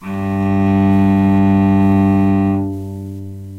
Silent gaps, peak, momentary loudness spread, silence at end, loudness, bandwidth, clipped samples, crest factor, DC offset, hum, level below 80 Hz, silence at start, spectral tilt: none; -4 dBFS; 14 LU; 0 s; -14 LUFS; 4.4 kHz; under 0.1%; 10 dB; under 0.1%; none; -42 dBFS; 0 s; -9.5 dB/octave